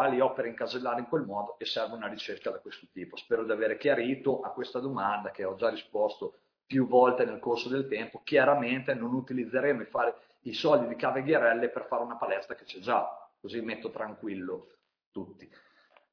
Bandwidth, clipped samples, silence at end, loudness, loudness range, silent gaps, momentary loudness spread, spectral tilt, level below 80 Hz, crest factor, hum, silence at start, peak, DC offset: 5.4 kHz; under 0.1%; 0.65 s; -30 LUFS; 7 LU; 15.06-15.12 s; 16 LU; -6.5 dB/octave; -76 dBFS; 22 dB; none; 0 s; -10 dBFS; under 0.1%